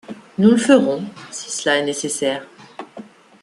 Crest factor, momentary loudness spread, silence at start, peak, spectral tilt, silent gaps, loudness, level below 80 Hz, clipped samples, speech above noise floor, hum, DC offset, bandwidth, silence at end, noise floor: 18 dB; 23 LU; 0.1 s; -2 dBFS; -4 dB/octave; none; -18 LUFS; -64 dBFS; under 0.1%; 23 dB; none; under 0.1%; 12.5 kHz; 0.4 s; -40 dBFS